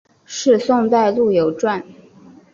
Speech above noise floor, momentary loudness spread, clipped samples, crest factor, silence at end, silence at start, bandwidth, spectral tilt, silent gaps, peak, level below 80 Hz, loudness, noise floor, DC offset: 29 dB; 8 LU; under 0.1%; 14 dB; 0.6 s; 0.3 s; 7.4 kHz; -5 dB/octave; none; -2 dBFS; -60 dBFS; -17 LUFS; -45 dBFS; under 0.1%